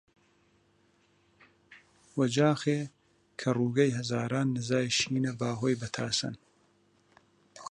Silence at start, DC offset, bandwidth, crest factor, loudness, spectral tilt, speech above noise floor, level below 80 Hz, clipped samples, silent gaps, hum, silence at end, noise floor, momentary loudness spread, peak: 1.7 s; under 0.1%; 11 kHz; 20 dB; -30 LUFS; -5 dB/octave; 39 dB; -70 dBFS; under 0.1%; none; 50 Hz at -70 dBFS; 0 s; -68 dBFS; 13 LU; -12 dBFS